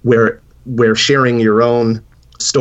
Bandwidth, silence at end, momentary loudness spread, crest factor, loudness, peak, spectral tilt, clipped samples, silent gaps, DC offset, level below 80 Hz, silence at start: 8.4 kHz; 0 s; 12 LU; 12 dB; -13 LUFS; -2 dBFS; -4.5 dB/octave; under 0.1%; none; under 0.1%; -48 dBFS; 0.05 s